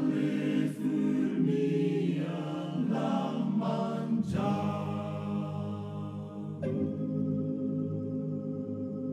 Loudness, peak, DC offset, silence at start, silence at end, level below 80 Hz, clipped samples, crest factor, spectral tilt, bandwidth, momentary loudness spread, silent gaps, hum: -32 LUFS; -18 dBFS; under 0.1%; 0 s; 0 s; -62 dBFS; under 0.1%; 14 dB; -8.5 dB/octave; 11.5 kHz; 8 LU; none; none